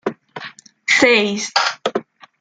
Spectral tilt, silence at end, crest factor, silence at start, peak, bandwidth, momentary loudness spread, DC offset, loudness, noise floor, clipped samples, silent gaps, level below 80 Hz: -2.5 dB/octave; 0.4 s; 20 dB; 0.05 s; 0 dBFS; 9.6 kHz; 21 LU; under 0.1%; -16 LUFS; -38 dBFS; under 0.1%; none; -62 dBFS